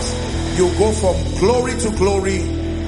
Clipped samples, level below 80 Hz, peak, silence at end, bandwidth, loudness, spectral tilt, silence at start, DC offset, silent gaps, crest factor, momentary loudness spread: under 0.1%; -26 dBFS; -2 dBFS; 0 s; 11.5 kHz; -18 LUFS; -5.5 dB/octave; 0 s; under 0.1%; none; 14 dB; 6 LU